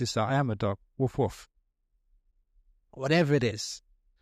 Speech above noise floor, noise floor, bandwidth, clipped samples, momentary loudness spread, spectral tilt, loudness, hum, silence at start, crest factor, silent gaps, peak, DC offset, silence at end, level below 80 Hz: 45 dB; -74 dBFS; 14 kHz; under 0.1%; 12 LU; -5.5 dB/octave; -29 LUFS; none; 0 s; 18 dB; none; -12 dBFS; under 0.1%; 0.45 s; -58 dBFS